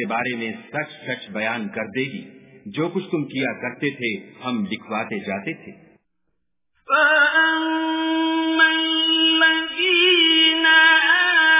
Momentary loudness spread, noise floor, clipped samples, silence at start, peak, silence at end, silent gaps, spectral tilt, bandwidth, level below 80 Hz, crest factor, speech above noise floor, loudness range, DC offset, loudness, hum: 16 LU; -77 dBFS; under 0.1%; 0 s; -4 dBFS; 0 s; none; 0 dB/octave; 3.9 kHz; -66 dBFS; 16 dB; 53 dB; 12 LU; under 0.1%; -18 LUFS; none